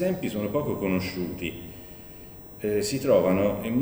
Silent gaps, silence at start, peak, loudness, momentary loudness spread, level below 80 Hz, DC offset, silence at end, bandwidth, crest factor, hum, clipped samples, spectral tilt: none; 0 s; -8 dBFS; -27 LUFS; 14 LU; -52 dBFS; under 0.1%; 0 s; over 20 kHz; 18 dB; none; under 0.1%; -6 dB/octave